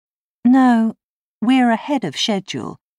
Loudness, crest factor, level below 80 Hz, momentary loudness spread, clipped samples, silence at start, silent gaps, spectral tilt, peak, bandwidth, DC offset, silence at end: -17 LUFS; 12 dB; -68 dBFS; 10 LU; under 0.1%; 0.45 s; 1.03-1.41 s; -4.5 dB/octave; -6 dBFS; 11 kHz; under 0.1%; 0.25 s